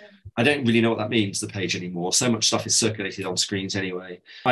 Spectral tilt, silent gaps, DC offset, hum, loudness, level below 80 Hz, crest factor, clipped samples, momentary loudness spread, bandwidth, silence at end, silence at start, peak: -3 dB/octave; none; under 0.1%; none; -23 LUFS; -56 dBFS; 18 dB; under 0.1%; 10 LU; 12.5 kHz; 0 s; 0 s; -6 dBFS